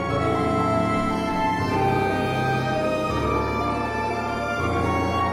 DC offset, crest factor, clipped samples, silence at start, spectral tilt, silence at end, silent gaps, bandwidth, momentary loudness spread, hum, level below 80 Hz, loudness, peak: under 0.1%; 14 dB; under 0.1%; 0 s; -6.5 dB/octave; 0 s; none; 16 kHz; 3 LU; none; -42 dBFS; -23 LUFS; -10 dBFS